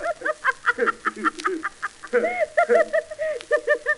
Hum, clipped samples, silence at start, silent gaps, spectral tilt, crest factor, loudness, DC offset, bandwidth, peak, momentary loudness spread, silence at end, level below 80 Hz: none; under 0.1%; 0 s; none; -3 dB/octave; 18 dB; -23 LUFS; under 0.1%; 11.5 kHz; -6 dBFS; 10 LU; 0 s; -60 dBFS